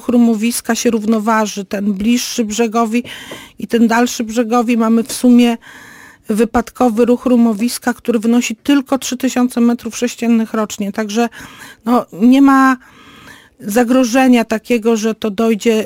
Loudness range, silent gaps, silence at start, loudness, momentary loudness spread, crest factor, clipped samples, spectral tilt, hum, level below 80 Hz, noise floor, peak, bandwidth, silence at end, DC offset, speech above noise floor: 3 LU; none; 0.05 s; -14 LUFS; 9 LU; 12 dB; under 0.1%; -4.5 dB/octave; none; -48 dBFS; -40 dBFS; -2 dBFS; 16.5 kHz; 0 s; under 0.1%; 26 dB